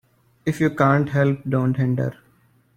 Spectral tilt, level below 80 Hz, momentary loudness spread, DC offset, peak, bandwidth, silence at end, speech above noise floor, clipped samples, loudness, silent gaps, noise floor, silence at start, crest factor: -8.5 dB/octave; -56 dBFS; 10 LU; under 0.1%; -4 dBFS; 14.5 kHz; 0.65 s; 39 dB; under 0.1%; -21 LUFS; none; -59 dBFS; 0.45 s; 18 dB